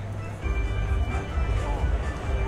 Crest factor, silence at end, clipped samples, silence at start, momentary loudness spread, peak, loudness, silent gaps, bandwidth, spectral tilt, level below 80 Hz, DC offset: 12 dB; 0 s; under 0.1%; 0 s; 3 LU; -14 dBFS; -29 LUFS; none; 10 kHz; -6.5 dB/octave; -28 dBFS; under 0.1%